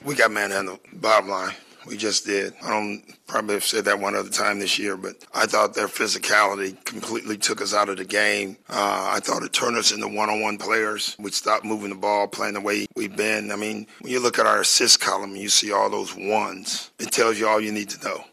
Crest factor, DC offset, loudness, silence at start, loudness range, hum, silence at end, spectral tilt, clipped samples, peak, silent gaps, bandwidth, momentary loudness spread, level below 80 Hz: 20 dB; under 0.1%; -22 LUFS; 0 s; 4 LU; none; 0.05 s; -1.5 dB/octave; under 0.1%; -2 dBFS; none; 15 kHz; 11 LU; -74 dBFS